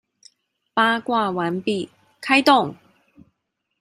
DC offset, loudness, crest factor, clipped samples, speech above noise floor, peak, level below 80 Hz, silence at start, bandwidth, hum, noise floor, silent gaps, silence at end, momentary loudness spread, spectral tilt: under 0.1%; -20 LUFS; 20 dB; under 0.1%; 57 dB; -2 dBFS; -70 dBFS; 0.75 s; 16 kHz; none; -77 dBFS; none; 1.05 s; 14 LU; -4.5 dB/octave